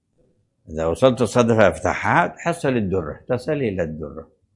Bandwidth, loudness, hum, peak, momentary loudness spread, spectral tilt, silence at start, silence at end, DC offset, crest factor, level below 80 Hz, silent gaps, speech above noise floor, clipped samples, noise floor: 11.5 kHz; -20 LUFS; none; 0 dBFS; 13 LU; -6 dB/octave; 0.7 s; 0.35 s; under 0.1%; 20 dB; -48 dBFS; none; 43 dB; under 0.1%; -63 dBFS